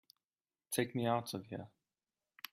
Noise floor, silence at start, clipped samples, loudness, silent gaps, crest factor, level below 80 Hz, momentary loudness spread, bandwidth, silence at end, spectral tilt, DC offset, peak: under -90 dBFS; 0.7 s; under 0.1%; -39 LUFS; none; 22 dB; -80 dBFS; 16 LU; 15.5 kHz; 0.85 s; -5 dB/octave; under 0.1%; -20 dBFS